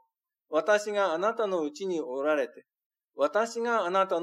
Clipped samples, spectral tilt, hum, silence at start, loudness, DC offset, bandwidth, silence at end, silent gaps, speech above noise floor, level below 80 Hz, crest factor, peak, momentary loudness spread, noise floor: under 0.1%; -4 dB/octave; none; 0.5 s; -28 LUFS; under 0.1%; 12.5 kHz; 0 s; 2.86-2.90 s; 47 dB; under -90 dBFS; 18 dB; -12 dBFS; 6 LU; -75 dBFS